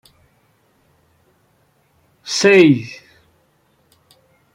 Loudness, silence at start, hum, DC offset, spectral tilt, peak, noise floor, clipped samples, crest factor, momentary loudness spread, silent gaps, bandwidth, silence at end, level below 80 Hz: -13 LUFS; 2.25 s; none; under 0.1%; -5 dB/octave; -2 dBFS; -60 dBFS; under 0.1%; 18 dB; 27 LU; none; 12 kHz; 1.6 s; -64 dBFS